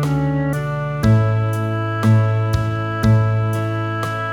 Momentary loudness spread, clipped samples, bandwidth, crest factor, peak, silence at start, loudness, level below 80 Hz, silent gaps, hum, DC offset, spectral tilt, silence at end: 6 LU; under 0.1%; 13.5 kHz; 14 dB; -4 dBFS; 0 s; -18 LUFS; -36 dBFS; none; none; under 0.1%; -8 dB/octave; 0 s